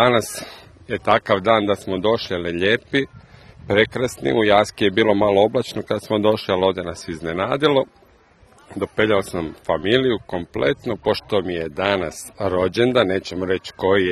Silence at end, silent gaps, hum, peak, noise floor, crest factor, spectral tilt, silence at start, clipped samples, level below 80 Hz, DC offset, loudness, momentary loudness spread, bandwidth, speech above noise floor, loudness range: 0 s; none; none; 0 dBFS; -52 dBFS; 20 dB; -5 dB/octave; 0 s; under 0.1%; -50 dBFS; under 0.1%; -20 LUFS; 11 LU; 13 kHz; 33 dB; 3 LU